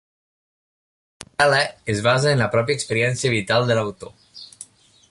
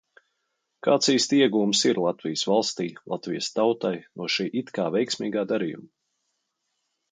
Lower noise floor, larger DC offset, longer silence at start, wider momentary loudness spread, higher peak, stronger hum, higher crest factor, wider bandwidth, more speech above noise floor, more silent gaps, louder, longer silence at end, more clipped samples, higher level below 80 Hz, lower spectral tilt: second, -45 dBFS vs -78 dBFS; neither; first, 1.2 s vs 0.85 s; first, 22 LU vs 11 LU; first, -4 dBFS vs -8 dBFS; neither; about the same, 18 dB vs 18 dB; first, 11.5 kHz vs 9.6 kHz; second, 26 dB vs 53 dB; neither; first, -20 LUFS vs -25 LUFS; second, 0.45 s vs 1.25 s; neither; first, -54 dBFS vs -74 dBFS; about the same, -4.5 dB/octave vs -3.5 dB/octave